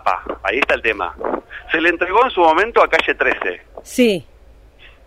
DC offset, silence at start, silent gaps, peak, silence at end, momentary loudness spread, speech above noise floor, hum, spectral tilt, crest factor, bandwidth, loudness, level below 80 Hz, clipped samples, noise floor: under 0.1%; 0.05 s; none; -2 dBFS; 0.85 s; 11 LU; 29 dB; none; -4 dB/octave; 16 dB; 15.5 kHz; -17 LUFS; -44 dBFS; under 0.1%; -45 dBFS